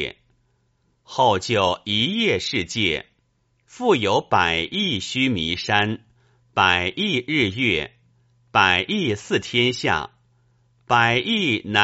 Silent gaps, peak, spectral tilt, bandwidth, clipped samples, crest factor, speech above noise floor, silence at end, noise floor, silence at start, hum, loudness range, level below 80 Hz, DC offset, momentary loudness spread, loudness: none; 0 dBFS; -2 dB/octave; 8 kHz; under 0.1%; 22 dB; 46 dB; 0 s; -67 dBFS; 0 s; none; 2 LU; -52 dBFS; under 0.1%; 8 LU; -20 LUFS